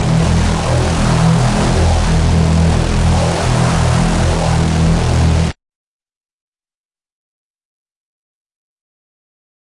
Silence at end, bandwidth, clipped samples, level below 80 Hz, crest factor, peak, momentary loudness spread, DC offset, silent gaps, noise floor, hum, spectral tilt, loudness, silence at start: 4.1 s; 11.5 kHz; under 0.1%; -22 dBFS; 12 dB; -2 dBFS; 2 LU; under 0.1%; none; under -90 dBFS; none; -6 dB/octave; -14 LUFS; 0 s